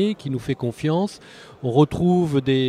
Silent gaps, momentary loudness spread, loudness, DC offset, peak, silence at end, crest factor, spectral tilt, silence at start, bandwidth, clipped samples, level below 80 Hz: none; 10 LU; -22 LUFS; under 0.1%; -4 dBFS; 0 s; 16 dB; -7.5 dB/octave; 0 s; 13 kHz; under 0.1%; -50 dBFS